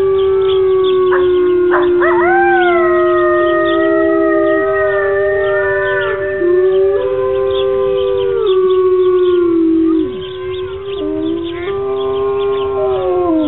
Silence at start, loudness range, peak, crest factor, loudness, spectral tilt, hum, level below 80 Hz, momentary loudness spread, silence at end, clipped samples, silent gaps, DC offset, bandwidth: 0 s; 5 LU; 0 dBFS; 12 dB; -13 LUFS; -3.5 dB/octave; none; -42 dBFS; 7 LU; 0 s; under 0.1%; none; 0.8%; 4.1 kHz